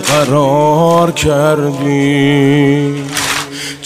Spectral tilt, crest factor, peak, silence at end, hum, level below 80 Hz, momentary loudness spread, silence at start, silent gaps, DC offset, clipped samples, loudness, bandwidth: -5 dB/octave; 12 dB; 0 dBFS; 0 s; none; -38 dBFS; 6 LU; 0 s; none; under 0.1%; under 0.1%; -11 LUFS; 16 kHz